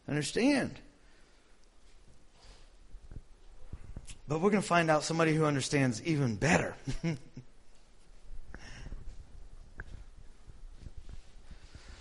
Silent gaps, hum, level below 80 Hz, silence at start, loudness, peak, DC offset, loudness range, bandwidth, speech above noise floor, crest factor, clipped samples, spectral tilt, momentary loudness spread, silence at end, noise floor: none; none; -50 dBFS; 0.05 s; -30 LUFS; -10 dBFS; under 0.1%; 23 LU; 11.5 kHz; 29 dB; 26 dB; under 0.1%; -5.5 dB/octave; 26 LU; 0 s; -59 dBFS